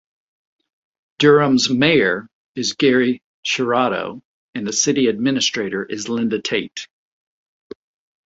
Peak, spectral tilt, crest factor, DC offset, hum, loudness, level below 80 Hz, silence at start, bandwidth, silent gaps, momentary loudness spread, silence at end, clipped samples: 0 dBFS; -3.5 dB/octave; 20 dB; under 0.1%; none; -18 LUFS; -60 dBFS; 1.2 s; 8 kHz; 2.33-2.55 s, 3.24-3.43 s, 4.25-4.53 s; 14 LU; 1.45 s; under 0.1%